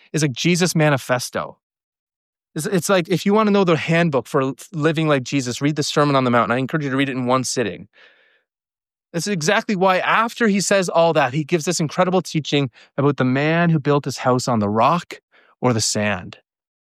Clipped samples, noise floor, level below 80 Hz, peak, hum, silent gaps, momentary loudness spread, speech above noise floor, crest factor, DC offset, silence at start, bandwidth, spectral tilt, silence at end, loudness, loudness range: under 0.1%; under -90 dBFS; -62 dBFS; -4 dBFS; none; 1.63-1.70 s, 1.84-1.92 s, 1.99-2.07 s, 2.16-2.33 s, 15.23-15.28 s; 7 LU; over 71 dB; 14 dB; under 0.1%; 0.15 s; 15 kHz; -5 dB/octave; 0.5 s; -19 LUFS; 3 LU